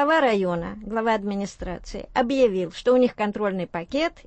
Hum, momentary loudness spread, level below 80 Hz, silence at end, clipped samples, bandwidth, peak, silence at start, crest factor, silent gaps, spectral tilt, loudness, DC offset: none; 10 LU; -46 dBFS; 0.15 s; under 0.1%; 8.6 kHz; -8 dBFS; 0 s; 16 dB; none; -6 dB/octave; -24 LUFS; under 0.1%